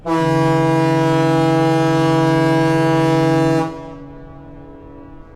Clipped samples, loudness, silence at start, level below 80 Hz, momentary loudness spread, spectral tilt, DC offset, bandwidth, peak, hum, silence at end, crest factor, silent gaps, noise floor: under 0.1%; -15 LUFS; 0.05 s; -44 dBFS; 6 LU; -7 dB/octave; under 0.1%; 13.5 kHz; -4 dBFS; none; 0.15 s; 12 dB; none; -37 dBFS